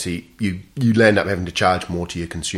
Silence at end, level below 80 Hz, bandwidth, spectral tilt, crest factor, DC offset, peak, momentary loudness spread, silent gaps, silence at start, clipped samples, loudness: 0 s; -44 dBFS; 14 kHz; -5 dB/octave; 18 dB; under 0.1%; -2 dBFS; 11 LU; none; 0 s; under 0.1%; -19 LUFS